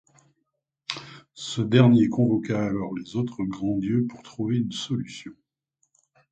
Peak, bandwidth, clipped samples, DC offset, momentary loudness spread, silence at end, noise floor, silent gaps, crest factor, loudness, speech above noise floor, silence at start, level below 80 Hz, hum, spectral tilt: -4 dBFS; 8.8 kHz; under 0.1%; under 0.1%; 19 LU; 1 s; -78 dBFS; none; 22 dB; -25 LUFS; 54 dB; 0.9 s; -60 dBFS; none; -7 dB/octave